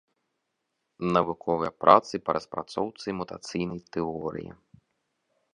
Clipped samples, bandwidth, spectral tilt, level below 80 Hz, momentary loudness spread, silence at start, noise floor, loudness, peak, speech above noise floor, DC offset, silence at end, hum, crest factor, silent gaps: under 0.1%; 10.5 kHz; -6 dB/octave; -60 dBFS; 15 LU; 1 s; -80 dBFS; -27 LUFS; -2 dBFS; 53 dB; under 0.1%; 1 s; none; 26 dB; none